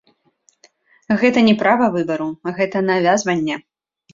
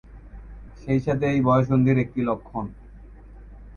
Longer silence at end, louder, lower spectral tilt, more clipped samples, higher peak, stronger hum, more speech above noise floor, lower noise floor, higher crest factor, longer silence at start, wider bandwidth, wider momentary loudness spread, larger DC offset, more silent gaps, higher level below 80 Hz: first, 0.55 s vs 0.05 s; first, -17 LUFS vs -23 LUFS; second, -5 dB/octave vs -9.5 dB/octave; neither; first, -2 dBFS vs -8 dBFS; neither; first, 44 dB vs 22 dB; first, -60 dBFS vs -44 dBFS; about the same, 16 dB vs 18 dB; first, 1.1 s vs 0.1 s; first, 7.6 kHz vs 6.8 kHz; second, 10 LU vs 20 LU; neither; neither; second, -60 dBFS vs -44 dBFS